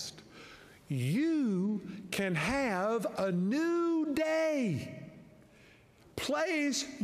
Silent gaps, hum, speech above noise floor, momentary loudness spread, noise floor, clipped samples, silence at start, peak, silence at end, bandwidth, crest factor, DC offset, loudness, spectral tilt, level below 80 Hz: none; none; 29 dB; 17 LU; -60 dBFS; under 0.1%; 0 s; -18 dBFS; 0 s; 15.5 kHz; 14 dB; under 0.1%; -32 LUFS; -5.5 dB/octave; -64 dBFS